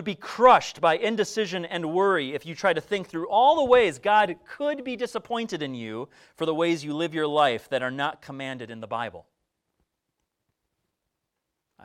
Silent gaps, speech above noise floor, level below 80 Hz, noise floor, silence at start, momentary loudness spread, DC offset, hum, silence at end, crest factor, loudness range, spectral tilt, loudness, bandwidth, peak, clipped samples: none; 58 dB; -64 dBFS; -82 dBFS; 0 s; 15 LU; under 0.1%; none; 2.65 s; 22 dB; 13 LU; -4.5 dB/octave; -24 LUFS; 13 kHz; -4 dBFS; under 0.1%